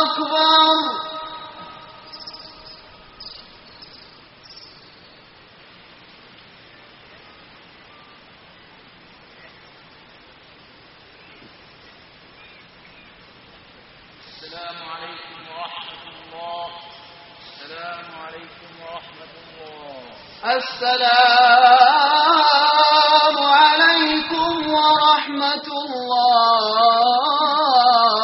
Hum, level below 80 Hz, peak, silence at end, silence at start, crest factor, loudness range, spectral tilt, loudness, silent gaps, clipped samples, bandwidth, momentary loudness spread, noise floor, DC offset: none; -62 dBFS; 0 dBFS; 0 s; 0 s; 20 dB; 24 LU; 2 dB/octave; -15 LUFS; none; under 0.1%; 6 kHz; 26 LU; -47 dBFS; under 0.1%